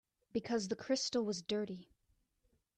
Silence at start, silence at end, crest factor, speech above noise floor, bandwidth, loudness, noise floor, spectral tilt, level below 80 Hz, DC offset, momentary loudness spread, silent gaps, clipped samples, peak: 0.35 s; 0.95 s; 18 dB; 41 dB; 9.8 kHz; -38 LUFS; -79 dBFS; -4 dB/octave; -76 dBFS; under 0.1%; 9 LU; none; under 0.1%; -22 dBFS